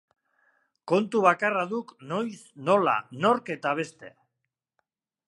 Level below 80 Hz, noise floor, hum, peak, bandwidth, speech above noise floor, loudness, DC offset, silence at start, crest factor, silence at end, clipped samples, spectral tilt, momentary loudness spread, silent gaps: -82 dBFS; -84 dBFS; none; -4 dBFS; 11.5 kHz; 58 dB; -26 LUFS; under 0.1%; 0.85 s; 24 dB; 1.2 s; under 0.1%; -6 dB/octave; 12 LU; none